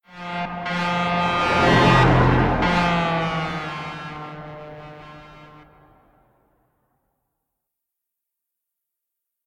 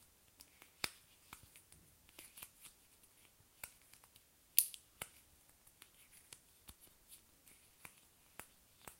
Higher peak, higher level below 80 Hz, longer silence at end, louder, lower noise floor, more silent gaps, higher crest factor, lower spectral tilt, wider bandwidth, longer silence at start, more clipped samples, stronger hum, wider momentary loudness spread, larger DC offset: about the same, -4 dBFS vs -4 dBFS; first, -38 dBFS vs -76 dBFS; first, 4 s vs 0.05 s; first, -20 LUFS vs -41 LUFS; first, -82 dBFS vs -69 dBFS; neither; second, 18 dB vs 48 dB; first, -6.5 dB/octave vs 0.5 dB/octave; second, 10.5 kHz vs 16.5 kHz; second, 0.15 s vs 0.4 s; neither; neither; about the same, 23 LU vs 22 LU; neither